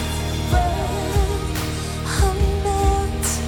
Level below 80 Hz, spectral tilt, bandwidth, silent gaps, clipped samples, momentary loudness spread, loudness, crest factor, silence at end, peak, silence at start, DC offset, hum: -24 dBFS; -5 dB/octave; 19 kHz; none; under 0.1%; 5 LU; -22 LUFS; 14 dB; 0 s; -6 dBFS; 0 s; under 0.1%; none